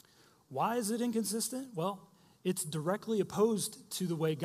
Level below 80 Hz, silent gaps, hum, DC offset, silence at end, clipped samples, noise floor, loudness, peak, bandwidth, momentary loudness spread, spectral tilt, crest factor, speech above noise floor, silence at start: -78 dBFS; none; none; under 0.1%; 0 s; under 0.1%; -65 dBFS; -34 LUFS; -16 dBFS; 15.5 kHz; 8 LU; -5 dB/octave; 18 dB; 31 dB; 0.5 s